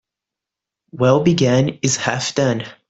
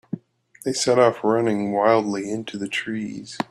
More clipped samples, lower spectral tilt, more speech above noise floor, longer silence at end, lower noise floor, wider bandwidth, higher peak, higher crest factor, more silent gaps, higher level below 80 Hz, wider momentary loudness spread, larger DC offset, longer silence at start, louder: neither; about the same, -5 dB/octave vs -4.5 dB/octave; first, 69 dB vs 19 dB; about the same, 0.15 s vs 0.05 s; first, -85 dBFS vs -41 dBFS; second, 8.2 kHz vs 13.5 kHz; about the same, -2 dBFS vs -4 dBFS; about the same, 16 dB vs 18 dB; neither; first, -52 dBFS vs -66 dBFS; second, 5 LU vs 14 LU; neither; first, 0.95 s vs 0.15 s; first, -17 LUFS vs -22 LUFS